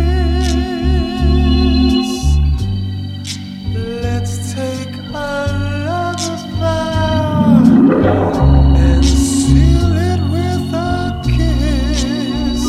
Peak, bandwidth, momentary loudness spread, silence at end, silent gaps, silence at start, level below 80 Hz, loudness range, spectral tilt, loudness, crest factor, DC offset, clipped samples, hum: 0 dBFS; 13 kHz; 11 LU; 0 s; none; 0 s; -18 dBFS; 9 LU; -6.5 dB/octave; -15 LUFS; 12 dB; under 0.1%; under 0.1%; none